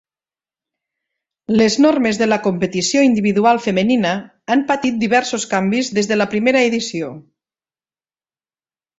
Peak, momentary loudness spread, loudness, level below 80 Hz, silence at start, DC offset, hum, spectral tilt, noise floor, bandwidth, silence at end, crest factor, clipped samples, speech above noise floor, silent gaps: -2 dBFS; 7 LU; -16 LUFS; -56 dBFS; 1.5 s; under 0.1%; none; -4.5 dB/octave; under -90 dBFS; 8 kHz; 1.8 s; 16 dB; under 0.1%; over 74 dB; none